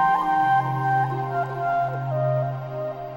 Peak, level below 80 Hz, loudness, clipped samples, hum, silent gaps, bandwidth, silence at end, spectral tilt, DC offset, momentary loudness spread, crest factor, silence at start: -10 dBFS; -56 dBFS; -24 LUFS; under 0.1%; none; none; 16.5 kHz; 0 s; -8 dB/octave; under 0.1%; 9 LU; 14 dB; 0 s